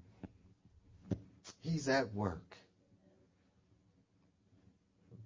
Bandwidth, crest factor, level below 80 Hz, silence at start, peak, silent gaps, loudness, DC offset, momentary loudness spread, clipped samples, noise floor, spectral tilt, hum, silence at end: 7.6 kHz; 24 dB; -64 dBFS; 0.2 s; -20 dBFS; none; -39 LUFS; under 0.1%; 22 LU; under 0.1%; -73 dBFS; -5.5 dB/octave; none; 0 s